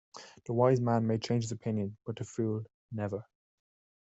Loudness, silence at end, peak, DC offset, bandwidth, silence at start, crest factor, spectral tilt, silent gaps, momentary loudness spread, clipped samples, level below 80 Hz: -32 LUFS; 0.8 s; -12 dBFS; under 0.1%; 8.2 kHz; 0.15 s; 20 dB; -7 dB/octave; 2.74-2.89 s; 15 LU; under 0.1%; -70 dBFS